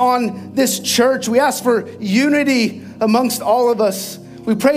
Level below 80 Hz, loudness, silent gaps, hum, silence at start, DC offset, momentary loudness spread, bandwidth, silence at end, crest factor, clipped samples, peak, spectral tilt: -60 dBFS; -16 LUFS; none; none; 0 s; under 0.1%; 7 LU; 16 kHz; 0 s; 14 dB; under 0.1%; -2 dBFS; -4 dB/octave